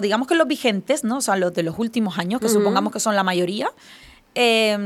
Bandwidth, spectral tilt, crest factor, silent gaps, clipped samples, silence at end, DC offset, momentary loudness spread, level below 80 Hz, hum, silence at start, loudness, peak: 15.5 kHz; -4 dB/octave; 16 dB; none; under 0.1%; 0 s; under 0.1%; 6 LU; -62 dBFS; none; 0 s; -20 LUFS; -4 dBFS